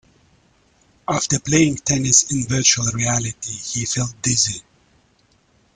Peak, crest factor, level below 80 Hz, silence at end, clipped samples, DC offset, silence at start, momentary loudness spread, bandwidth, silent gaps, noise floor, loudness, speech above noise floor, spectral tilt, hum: 0 dBFS; 20 dB; -48 dBFS; 1.15 s; under 0.1%; under 0.1%; 1.1 s; 11 LU; 10.5 kHz; none; -59 dBFS; -18 LUFS; 40 dB; -3 dB/octave; none